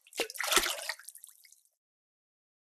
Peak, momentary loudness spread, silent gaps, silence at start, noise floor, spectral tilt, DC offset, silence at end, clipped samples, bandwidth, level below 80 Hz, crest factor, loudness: -10 dBFS; 21 LU; none; 0.15 s; -62 dBFS; 1 dB/octave; under 0.1%; 1.45 s; under 0.1%; 15.5 kHz; -64 dBFS; 28 dB; -30 LUFS